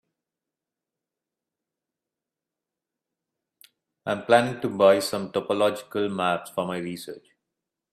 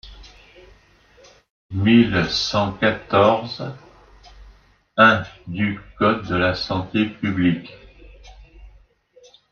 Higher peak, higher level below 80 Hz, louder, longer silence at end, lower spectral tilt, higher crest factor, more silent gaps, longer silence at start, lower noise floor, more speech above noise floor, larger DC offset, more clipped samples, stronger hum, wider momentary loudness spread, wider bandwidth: about the same, -4 dBFS vs -2 dBFS; second, -72 dBFS vs -48 dBFS; second, -24 LUFS vs -19 LUFS; about the same, 0.75 s vs 0.85 s; about the same, -5 dB/octave vs -6 dB/octave; about the same, 24 dB vs 20 dB; second, none vs 1.50-1.69 s; first, 4.05 s vs 0.05 s; first, -88 dBFS vs -53 dBFS; first, 64 dB vs 34 dB; neither; neither; neither; about the same, 16 LU vs 15 LU; first, 14.5 kHz vs 7 kHz